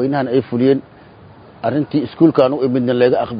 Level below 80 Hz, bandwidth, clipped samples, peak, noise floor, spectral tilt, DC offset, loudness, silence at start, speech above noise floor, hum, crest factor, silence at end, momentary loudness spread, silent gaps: -52 dBFS; 5.2 kHz; under 0.1%; 0 dBFS; -41 dBFS; -10 dB/octave; under 0.1%; -16 LUFS; 0 s; 26 dB; none; 16 dB; 0 s; 7 LU; none